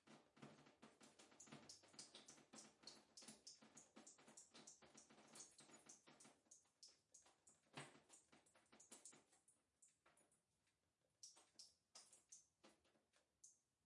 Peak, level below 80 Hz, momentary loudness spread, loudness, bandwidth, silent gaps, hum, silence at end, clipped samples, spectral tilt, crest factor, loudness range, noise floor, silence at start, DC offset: -42 dBFS; under -90 dBFS; 6 LU; -65 LUFS; 12 kHz; none; none; 0 s; under 0.1%; -2 dB/octave; 26 dB; 5 LU; under -90 dBFS; 0 s; under 0.1%